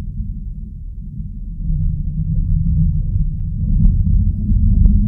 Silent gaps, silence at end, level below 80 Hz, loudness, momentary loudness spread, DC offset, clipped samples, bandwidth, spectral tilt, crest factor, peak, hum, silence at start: none; 0 s; -18 dBFS; -19 LUFS; 15 LU; under 0.1%; under 0.1%; 0.7 kHz; -14 dB/octave; 16 dB; 0 dBFS; none; 0 s